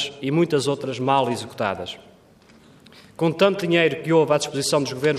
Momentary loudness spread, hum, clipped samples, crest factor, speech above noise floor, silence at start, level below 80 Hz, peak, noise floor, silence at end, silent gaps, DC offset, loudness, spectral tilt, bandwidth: 8 LU; none; under 0.1%; 16 dB; 31 dB; 0 s; -66 dBFS; -6 dBFS; -52 dBFS; 0 s; none; under 0.1%; -21 LUFS; -5 dB/octave; 15 kHz